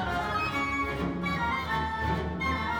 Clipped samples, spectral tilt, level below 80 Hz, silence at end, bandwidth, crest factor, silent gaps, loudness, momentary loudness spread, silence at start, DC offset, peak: under 0.1%; -6 dB/octave; -42 dBFS; 0 s; 19 kHz; 14 dB; none; -29 LUFS; 2 LU; 0 s; under 0.1%; -16 dBFS